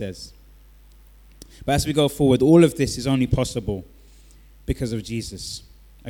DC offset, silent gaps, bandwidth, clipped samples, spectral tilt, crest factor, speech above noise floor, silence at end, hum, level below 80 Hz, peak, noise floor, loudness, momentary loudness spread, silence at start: under 0.1%; none; 18.5 kHz; under 0.1%; -6 dB/octave; 20 dB; 28 dB; 0 s; none; -40 dBFS; -4 dBFS; -49 dBFS; -21 LUFS; 19 LU; 0 s